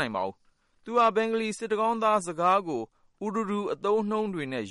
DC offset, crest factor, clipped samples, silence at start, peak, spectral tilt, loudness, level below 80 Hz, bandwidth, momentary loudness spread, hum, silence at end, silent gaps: under 0.1%; 16 dB; under 0.1%; 0 s; -12 dBFS; -5 dB/octave; -27 LUFS; -70 dBFS; 11.5 kHz; 11 LU; none; 0 s; none